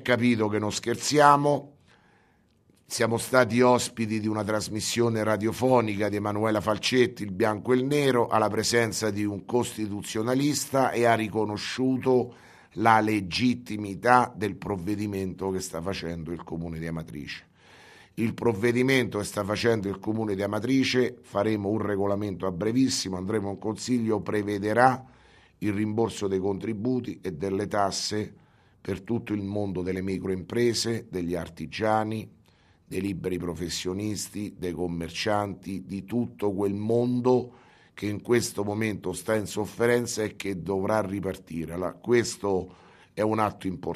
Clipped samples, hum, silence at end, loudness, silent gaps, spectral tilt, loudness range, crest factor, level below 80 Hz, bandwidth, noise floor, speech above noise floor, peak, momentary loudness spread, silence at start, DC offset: under 0.1%; none; 0 s; -27 LUFS; none; -5 dB/octave; 6 LU; 24 dB; -58 dBFS; 14.5 kHz; -64 dBFS; 37 dB; -4 dBFS; 11 LU; 0 s; under 0.1%